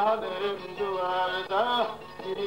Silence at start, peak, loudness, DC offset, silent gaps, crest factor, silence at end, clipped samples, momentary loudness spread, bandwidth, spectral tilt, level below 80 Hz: 0 s; -14 dBFS; -29 LUFS; 0.2%; none; 14 dB; 0 s; under 0.1%; 7 LU; 16 kHz; -4.5 dB/octave; -64 dBFS